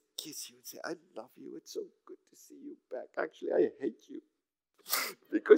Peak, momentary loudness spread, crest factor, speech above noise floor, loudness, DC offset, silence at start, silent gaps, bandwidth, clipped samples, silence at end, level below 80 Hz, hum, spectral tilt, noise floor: -8 dBFS; 20 LU; 26 dB; 38 dB; -37 LUFS; under 0.1%; 0.2 s; none; 16 kHz; under 0.1%; 0 s; under -90 dBFS; none; -2.5 dB/octave; -72 dBFS